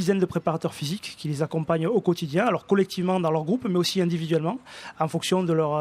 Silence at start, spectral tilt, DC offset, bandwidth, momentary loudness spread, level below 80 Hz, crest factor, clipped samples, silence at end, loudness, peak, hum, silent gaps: 0 s; -6 dB/octave; under 0.1%; 15 kHz; 8 LU; -64 dBFS; 16 dB; under 0.1%; 0 s; -25 LUFS; -8 dBFS; none; none